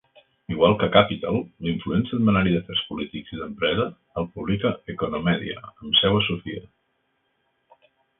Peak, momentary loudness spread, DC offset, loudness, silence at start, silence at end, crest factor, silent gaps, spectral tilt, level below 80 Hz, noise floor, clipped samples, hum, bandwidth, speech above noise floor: -2 dBFS; 15 LU; under 0.1%; -23 LUFS; 0.5 s; 1.6 s; 24 dB; none; -10.5 dB/octave; -48 dBFS; -71 dBFS; under 0.1%; none; 4 kHz; 48 dB